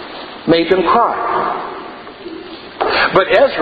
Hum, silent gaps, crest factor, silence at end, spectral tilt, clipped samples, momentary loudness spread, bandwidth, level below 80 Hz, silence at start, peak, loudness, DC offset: none; none; 16 dB; 0 s; -7 dB/octave; under 0.1%; 19 LU; 7.2 kHz; -46 dBFS; 0 s; 0 dBFS; -14 LUFS; under 0.1%